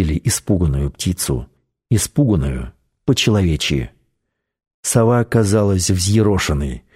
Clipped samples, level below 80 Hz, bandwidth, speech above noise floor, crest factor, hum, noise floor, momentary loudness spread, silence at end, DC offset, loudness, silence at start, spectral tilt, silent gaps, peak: under 0.1%; -30 dBFS; 16 kHz; 58 dB; 14 dB; none; -74 dBFS; 10 LU; 0.15 s; under 0.1%; -17 LUFS; 0 s; -5 dB/octave; 4.74-4.83 s; -2 dBFS